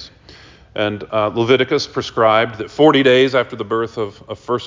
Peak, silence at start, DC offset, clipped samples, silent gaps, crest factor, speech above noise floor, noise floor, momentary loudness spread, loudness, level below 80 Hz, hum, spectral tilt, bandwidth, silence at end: -2 dBFS; 0 s; under 0.1%; under 0.1%; none; 16 dB; 27 dB; -43 dBFS; 12 LU; -16 LUFS; -50 dBFS; none; -5.5 dB/octave; 7.6 kHz; 0 s